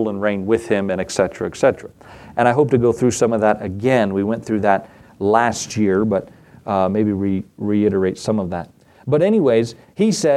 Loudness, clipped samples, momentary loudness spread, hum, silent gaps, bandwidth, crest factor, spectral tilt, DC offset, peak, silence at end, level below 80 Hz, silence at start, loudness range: -18 LUFS; under 0.1%; 8 LU; none; none; 13 kHz; 18 dB; -6 dB/octave; under 0.1%; 0 dBFS; 0 s; -52 dBFS; 0 s; 2 LU